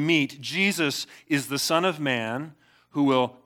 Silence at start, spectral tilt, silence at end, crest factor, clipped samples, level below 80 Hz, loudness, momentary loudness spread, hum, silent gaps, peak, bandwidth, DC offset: 0 s; -4 dB/octave; 0.15 s; 18 dB; under 0.1%; -78 dBFS; -25 LUFS; 10 LU; none; none; -8 dBFS; 19 kHz; under 0.1%